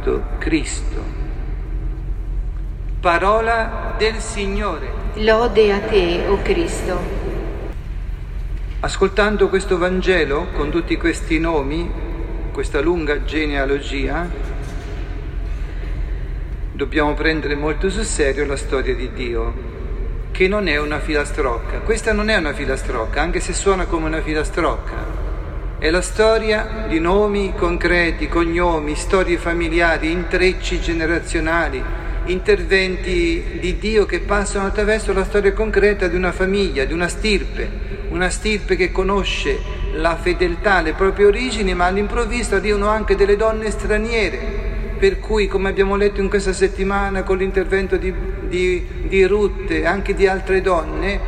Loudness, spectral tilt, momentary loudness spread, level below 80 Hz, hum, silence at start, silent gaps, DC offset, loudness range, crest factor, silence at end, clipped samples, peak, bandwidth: -19 LUFS; -5 dB/octave; 12 LU; -24 dBFS; none; 0 s; none; under 0.1%; 4 LU; 18 dB; 0 s; under 0.1%; 0 dBFS; 10.5 kHz